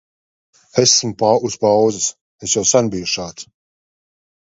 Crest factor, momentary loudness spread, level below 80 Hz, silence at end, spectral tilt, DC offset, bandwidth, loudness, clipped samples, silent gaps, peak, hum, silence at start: 18 dB; 11 LU; -54 dBFS; 1 s; -3 dB/octave; under 0.1%; 8 kHz; -16 LUFS; under 0.1%; 2.21-2.38 s; 0 dBFS; none; 0.75 s